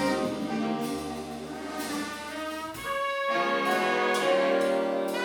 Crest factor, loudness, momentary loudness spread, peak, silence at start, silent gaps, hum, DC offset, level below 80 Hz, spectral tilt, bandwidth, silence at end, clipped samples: 14 dB; -28 LUFS; 11 LU; -14 dBFS; 0 s; none; none; under 0.1%; -62 dBFS; -4 dB/octave; over 20 kHz; 0 s; under 0.1%